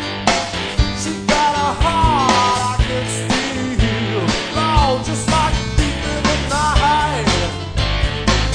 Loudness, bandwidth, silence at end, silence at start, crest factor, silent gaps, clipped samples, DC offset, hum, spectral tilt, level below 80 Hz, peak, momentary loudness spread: -17 LUFS; 10 kHz; 0 s; 0 s; 16 dB; none; under 0.1%; under 0.1%; none; -4.5 dB/octave; -24 dBFS; 0 dBFS; 5 LU